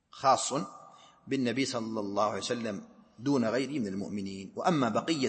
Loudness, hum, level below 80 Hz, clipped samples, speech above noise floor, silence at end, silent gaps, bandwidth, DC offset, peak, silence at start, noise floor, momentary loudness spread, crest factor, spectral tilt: -31 LUFS; none; -74 dBFS; under 0.1%; 24 dB; 0 s; none; 8.8 kHz; under 0.1%; -12 dBFS; 0.15 s; -55 dBFS; 11 LU; 20 dB; -4.5 dB/octave